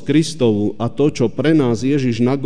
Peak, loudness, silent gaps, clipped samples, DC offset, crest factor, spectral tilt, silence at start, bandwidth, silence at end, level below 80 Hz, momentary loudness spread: -4 dBFS; -17 LUFS; none; under 0.1%; 3%; 12 dB; -6.5 dB/octave; 0 s; 10 kHz; 0 s; -52 dBFS; 3 LU